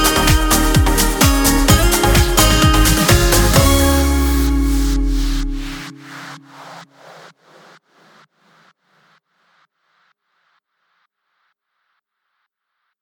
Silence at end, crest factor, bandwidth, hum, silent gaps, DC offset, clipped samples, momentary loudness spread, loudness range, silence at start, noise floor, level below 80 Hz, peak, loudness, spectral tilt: 6.2 s; 16 dB; 19.5 kHz; none; none; under 0.1%; under 0.1%; 20 LU; 17 LU; 0 s; -74 dBFS; -20 dBFS; 0 dBFS; -14 LUFS; -4 dB/octave